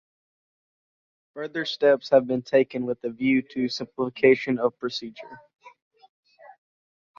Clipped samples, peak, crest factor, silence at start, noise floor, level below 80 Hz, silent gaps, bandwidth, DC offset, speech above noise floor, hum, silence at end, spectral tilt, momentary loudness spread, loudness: under 0.1%; -6 dBFS; 20 dB; 1.35 s; under -90 dBFS; -68 dBFS; none; 7.2 kHz; under 0.1%; over 66 dB; none; 1.5 s; -6 dB/octave; 16 LU; -24 LUFS